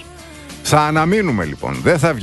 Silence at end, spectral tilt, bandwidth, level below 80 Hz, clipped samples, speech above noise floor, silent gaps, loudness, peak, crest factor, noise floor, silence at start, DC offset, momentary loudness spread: 0 s; -5.5 dB/octave; 12.5 kHz; -40 dBFS; under 0.1%; 21 dB; none; -16 LUFS; 0 dBFS; 16 dB; -36 dBFS; 0 s; under 0.1%; 21 LU